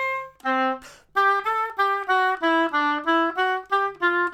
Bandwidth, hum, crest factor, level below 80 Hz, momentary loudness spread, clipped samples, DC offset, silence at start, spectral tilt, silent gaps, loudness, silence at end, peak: 16.5 kHz; none; 14 dB; -64 dBFS; 6 LU; under 0.1%; under 0.1%; 0 s; -3 dB/octave; none; -22 LUFS; 0 s; -10 dBFS